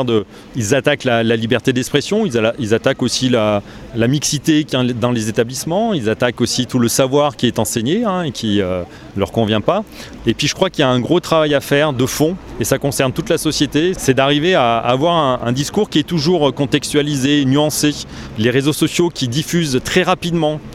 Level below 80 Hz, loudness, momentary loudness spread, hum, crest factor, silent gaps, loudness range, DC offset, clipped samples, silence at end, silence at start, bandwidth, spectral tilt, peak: -42 dBFS; -16 LUFS; 5 LU; none; 16 dB; none; 2 LU; under 0.1%; under 0.1%; 0 s; 0 s; 16.5 kHz; -4.5 dB/octave; 0 dBFS